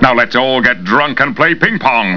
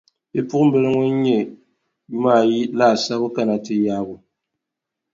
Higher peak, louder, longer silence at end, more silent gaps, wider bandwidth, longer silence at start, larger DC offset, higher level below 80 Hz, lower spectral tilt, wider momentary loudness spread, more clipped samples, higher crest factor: about the same, 0 dBFS vs -2 dBFS; first, -11 LUFS vs -19 LUFS; second, 0 s vs 0.95 s; neither; second, 5.4 kHz vs 7.6 kHz; second, 0 s vs 0.35 s; first, 1% vs under 0.1%; first, -40 dBFS vs -62 dBFS; about the same, -6 dB/octave vs -6.5 dB/octave; second, 2 LU vs 11 LU; first, 0.5% vs under 0.1%; second, 12 dB vs 18 dB